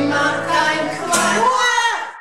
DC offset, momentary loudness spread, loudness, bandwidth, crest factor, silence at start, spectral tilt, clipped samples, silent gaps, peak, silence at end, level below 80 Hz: 0.6%; 4 LU; -16 LUFS; 16 kHz; 14 dB; 0 s; -2 dB/octave; under 0.1%; none; -2 dBFS; 0 s; -60 dBFS